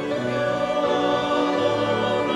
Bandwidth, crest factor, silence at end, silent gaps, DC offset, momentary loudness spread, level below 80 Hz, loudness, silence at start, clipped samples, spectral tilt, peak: 11 kHz; 14 dB; 0 s; none; under 0.1%; 3 LU; -56 dBFS; -22 LUFS; 0 s; under 0.1%; -5.5 dB/octave; -8 dBFS